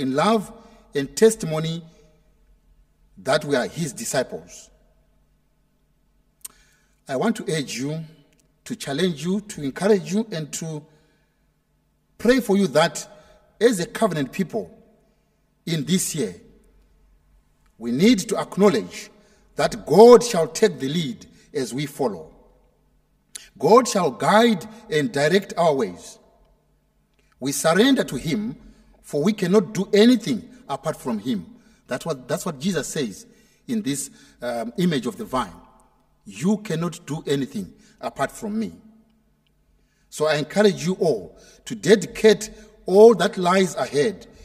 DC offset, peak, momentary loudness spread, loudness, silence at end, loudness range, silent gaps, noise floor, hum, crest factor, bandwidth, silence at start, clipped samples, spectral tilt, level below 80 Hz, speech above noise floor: under 0.1%; 0 dBFS; 18 LU; -21 LUFS; 0.2 s; 10 LU; none; -66 dBFS; none; 22 dB; 16 kHz; 0 s; under 0.1%; -5 dB/octave; -56 dBFS; 45 dB